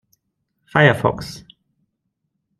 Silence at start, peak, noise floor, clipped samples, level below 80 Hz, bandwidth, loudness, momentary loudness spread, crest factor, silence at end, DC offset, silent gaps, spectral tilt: 0.75 s; -2 dBFS; -75 dBFS; under 0.1%; -52 dBFS; 13 kHz; -17 LUFS; 20 LU; 20 dB; 1.2 s; under 0.1%; none; -6.5 dB/octave